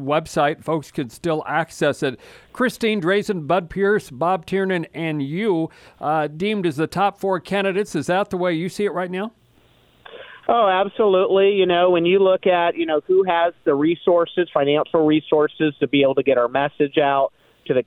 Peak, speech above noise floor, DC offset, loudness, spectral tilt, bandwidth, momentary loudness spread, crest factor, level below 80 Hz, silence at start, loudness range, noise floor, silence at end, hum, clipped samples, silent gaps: -4 dBFS; 36 dB; under 0.1%; -20 LUFS; -6 dB/octave; 13.5 kHz; 9 LU; 16 dB; -56 dBFS; 0 s; 5 LU; -56 dBFS; 0.05 s; none; under 0.1%; none